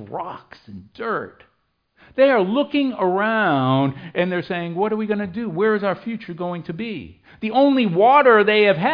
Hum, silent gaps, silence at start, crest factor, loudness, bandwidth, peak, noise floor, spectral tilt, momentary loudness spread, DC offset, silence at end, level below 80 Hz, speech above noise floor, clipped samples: none; none; 0 s; 16 dB; -19 LUFS; 5.2 kHz; -2 dBFS; -64 dBFS; -9 dB/octave; 17 LU; under 0.1%; 0 s; -62 dBFS; 45 dB; under 0.1%